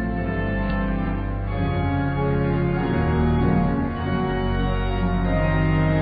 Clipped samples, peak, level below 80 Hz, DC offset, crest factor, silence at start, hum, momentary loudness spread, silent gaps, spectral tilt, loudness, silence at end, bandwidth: under 0.1%; -8 dBFS; -28 dBFS; under 0.1%; 14 dB; 0 s; none; 5 LU; none; -12 dB/octave; -23 LUFS; 0 s; 5 kHz